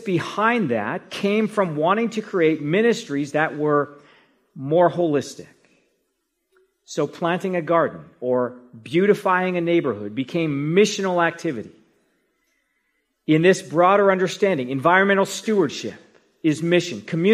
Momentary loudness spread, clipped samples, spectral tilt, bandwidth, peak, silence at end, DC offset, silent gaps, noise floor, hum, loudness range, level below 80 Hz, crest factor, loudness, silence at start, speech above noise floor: 11 LU; under 0.1%; -5.5 dB/octave; 14.5 kHz; -2 dBFS; 0 s; under 0.1%; none; -74 dBFS; none; 6 LU; -70 dBFS; 18 dB; -21 LUFS; 0 s; 54 dB